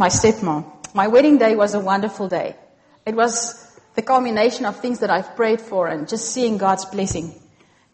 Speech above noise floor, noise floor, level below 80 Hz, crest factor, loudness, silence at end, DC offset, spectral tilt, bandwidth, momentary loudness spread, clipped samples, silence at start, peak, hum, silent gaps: 36 dB; -54 dBFS; -50 dBFS; 16 dB; -19 LUFS; 0.6 s; under 0.1%; -4 dB/octave; 8.8 kHz; 13 LU; under 0.1%; 0 s; -4 dBFS; none; none